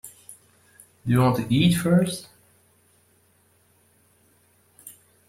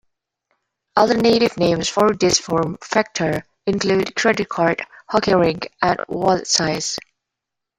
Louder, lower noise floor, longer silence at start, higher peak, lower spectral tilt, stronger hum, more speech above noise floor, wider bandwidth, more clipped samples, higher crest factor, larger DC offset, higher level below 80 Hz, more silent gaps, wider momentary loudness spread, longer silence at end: second, -22 LUFS vs -19 LUFS; second, -62 dBFS vs -83 dBFS; second, 0.05 s vs 0.95 s; second, -8 dBFS vs -2 dBFS; first, -6 dB/octave vs -4 dB/octave; neither; second, 42 dB vs 65 dB; about the same, 16 kHz vs 16 kHz; neither; about the same, 18 dB vs 18 dB; neither; about the same, -56 dBFS vs -52 dBFS; neither; first, 26 LU vs 8 LU; second, 0.35 s vs 0.8 s